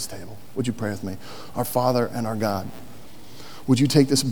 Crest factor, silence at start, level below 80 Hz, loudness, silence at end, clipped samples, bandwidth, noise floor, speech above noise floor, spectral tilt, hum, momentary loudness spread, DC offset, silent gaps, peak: 22 dB; 0 s; -58 dBFS; -24 LUFS; 0 s; under 0.1%; over 20 kHz; -45 dBFS; 22 dB; -5.5 dB/octave; none; 24 LU; 2%; none; -2 dBFS